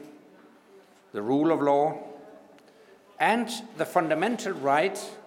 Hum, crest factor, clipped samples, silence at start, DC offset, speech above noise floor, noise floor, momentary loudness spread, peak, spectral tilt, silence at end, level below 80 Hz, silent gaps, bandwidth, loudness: none; 20 dB; under 0.1%; 0 s; under 0.1%; 30 dB; -55 dBFS; 15 LU; -8 dBFS; -5 dB/octave; 0.05 s; -84 dBFS; none; 17.5 kHz; -26 LUFS